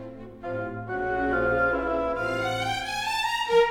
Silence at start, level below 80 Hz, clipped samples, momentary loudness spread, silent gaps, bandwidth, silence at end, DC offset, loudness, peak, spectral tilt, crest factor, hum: 0 s; -46 dBFS; under 0.1%; 10 LU; none; 19 kHz; 0 s; under 0.1%; -26 LUFS; -10 dBFS; -4.5 dB/octave; 16 dB; none